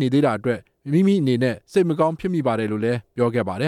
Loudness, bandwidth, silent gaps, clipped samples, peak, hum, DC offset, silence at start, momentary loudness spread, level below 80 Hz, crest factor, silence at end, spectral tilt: -21 LUFS; 12.5 kHz; none; under 0.1%; -6 dBFS; none; under 0.1%; 0 s; 6 LU; -58 dBFS; 14 dB; 0 s; -7.5 dB/octave